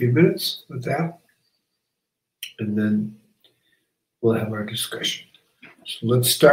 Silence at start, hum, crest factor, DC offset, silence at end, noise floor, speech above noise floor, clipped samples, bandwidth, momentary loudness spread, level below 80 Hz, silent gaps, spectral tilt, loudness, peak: 0 s; none; 22 dB; under 0.1%; 0 s; -81 dBFS; 61 dB; under 0.1%; 16 kHz; 15 LU; -66 dBFS; none; -5 dB/octave; -23 LUFS; 0 dBFS